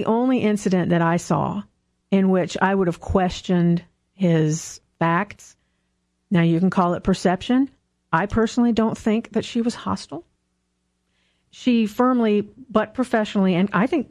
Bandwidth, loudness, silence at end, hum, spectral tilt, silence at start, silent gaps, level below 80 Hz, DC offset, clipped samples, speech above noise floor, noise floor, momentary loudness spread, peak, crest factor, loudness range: 12 kHz; -21 LUFS; 0.05 s; none; -6.5 dB/octave; 0 s; none; -48 dBFS; under 0.1%; under 0.1%; 52 dB; -72 dBFS; 7 LU; -4 dBFS; 16 dB; 3 LU